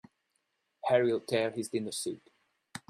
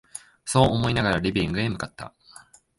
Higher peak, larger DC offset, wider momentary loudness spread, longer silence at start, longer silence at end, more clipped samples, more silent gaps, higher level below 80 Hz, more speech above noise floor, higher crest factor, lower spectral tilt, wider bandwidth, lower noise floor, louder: second, -14 dBFS vs -4 dBFS; neither; second, 14 LU vs 20 LU; first, 0.85 s vs 0.15 s; second, 0.1 s vs 0.7 s; neither; neither; second, -76 dBFS vs -44 dBFS; first, 49 dB vs 28 dB; about the same, 20 dB vs 22 dB; about the same, -4.5 dB/octave vs -5 dB/octave; first, 15 kHz vs 11.5 kHz; first, -79 dBFS vs -51 dBFS; second, -31 LUFS vs -23 LUFS